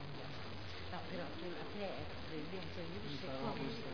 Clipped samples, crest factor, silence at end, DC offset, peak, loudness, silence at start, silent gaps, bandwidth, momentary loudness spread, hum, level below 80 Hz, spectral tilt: under 0.1%; 16 dB; 0 s; 0.4%; -28 dBFS; -46 LUFS; 0 s; none; 5.4 kHz; 5 LU; none; -62 dBFS; -4 dB/octave